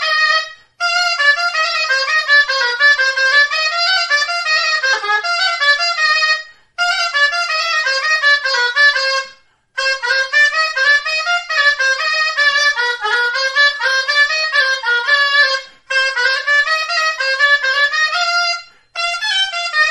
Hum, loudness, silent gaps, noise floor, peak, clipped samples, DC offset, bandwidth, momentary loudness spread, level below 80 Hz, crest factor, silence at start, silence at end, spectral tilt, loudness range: none; -13 LUFS; none; -45 dBFS; 0 dBFS; under 0.1%; under 0.1%; 11.5 kHz; 6 LU; -62 dBFS; 14 dB; 0 s; 0 s; 3.5 dB/octave; 2 LU